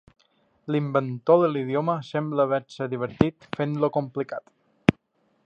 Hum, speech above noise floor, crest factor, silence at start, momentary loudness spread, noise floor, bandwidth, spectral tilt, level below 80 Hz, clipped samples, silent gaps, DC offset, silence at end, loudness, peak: none; 44 dB; 24 dB; 0.65 s; 11 LU; -68 dBFS; 8.4 kHz; -8.5 dB/octave; -54 dBFS; under 0.1%; none; under 0.1%; 0.55 s; -25 LUFS; 0 dBFS